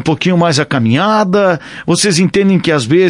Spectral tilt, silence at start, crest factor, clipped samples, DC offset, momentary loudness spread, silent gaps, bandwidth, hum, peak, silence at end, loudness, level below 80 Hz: -5 dB/octave; 0 s; 12 dB; under 0.1%; under 0.1%; 3 LU; none; 11.5 kHz; none; 0 dBFS; 0 s; -12 LUFS; -48 dBFS